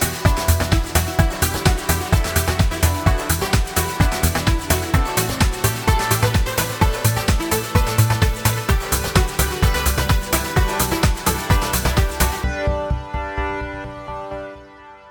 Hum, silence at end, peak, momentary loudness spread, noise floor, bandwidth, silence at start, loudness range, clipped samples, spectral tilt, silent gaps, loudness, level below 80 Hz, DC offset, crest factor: none; 0 s; -2 dBFS; 7 LU; -42 dBFS; 19.5 kHz; 0 s; 2 LU; under 0.1%; -4.5 dB/octave; none; -19 LUFS; -24 dBFS; under 0.1%; 16 dB